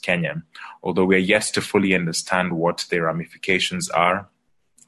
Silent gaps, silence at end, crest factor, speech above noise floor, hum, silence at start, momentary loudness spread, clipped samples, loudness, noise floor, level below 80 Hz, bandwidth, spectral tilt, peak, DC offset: none; 0.65 s; 18 dB; 41 dB; none; 0.05 s; 9 LU; under 0.1%; -21 LUFS; -62 dBFS; -54 dBFS; 12.5 kHz; -4 dB/octave; -4 dBFS; under 0.1%